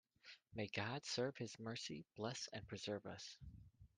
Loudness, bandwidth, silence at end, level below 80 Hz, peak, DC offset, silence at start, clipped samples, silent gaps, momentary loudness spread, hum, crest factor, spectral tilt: -48 LUFS; 11 kHz; 0.1 s; -72 dBFS; -28 dBFS; under 0.1%; 0.25 s; under 0.1%; none; 17 LU; none; 22 dB; -4 dB/octave